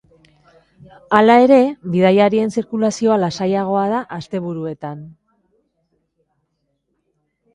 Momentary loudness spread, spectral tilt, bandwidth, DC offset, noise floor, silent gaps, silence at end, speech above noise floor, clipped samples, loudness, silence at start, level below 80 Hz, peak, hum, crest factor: 16 LU; -6.5 dB/octave; 11 kHz; under 0.1%; -70 dBFS; none; 2.45 s; 55 dB; under 0.1%; -16 LUFS; 1.1 s; -60 dBFS; 0 dBFS; none; 18 dB